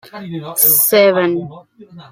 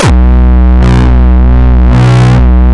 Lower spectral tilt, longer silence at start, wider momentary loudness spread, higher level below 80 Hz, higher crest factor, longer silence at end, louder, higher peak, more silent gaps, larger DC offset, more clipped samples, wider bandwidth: second, -3 dB/octave vs -7.5 dB/octave; first, 0.15 s vs 0 s; first, 19 LU vs 1 LU; second, -62 dBFS vs -6 dBFS; first, 16 dB vs 4 dB; about the same, 0.1 s vs 0 s; second, -12 LUFS vs -6 LUFS; about the same, 0 dBFS vs 0 dBFS; neither; neither; neither; first, 16.5 kHz vs 9.6 kHz